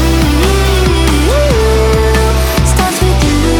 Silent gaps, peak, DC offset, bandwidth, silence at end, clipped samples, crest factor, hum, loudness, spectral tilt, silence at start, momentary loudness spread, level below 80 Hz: none; 0 dBFS; under 0.1%; 19.5 kHz; 0 s; under 0.1%; 10 dB; none; -10 LUFS; -5 dB/octave; 0 s; 1 LU; -12 dBFS